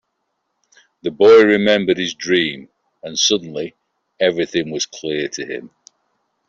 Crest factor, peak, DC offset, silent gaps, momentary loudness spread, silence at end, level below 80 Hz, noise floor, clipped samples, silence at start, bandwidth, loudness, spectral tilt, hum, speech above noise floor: 16 dB; -2 dBFS; under 0.1%; none; 18 LU; 0.8 s; -62 dBFS; -72 dBFS; under 0.1%; 1.05 s; 7.6 kHz; -16 LUFS; -3.5 dB/octave; none; 56 dB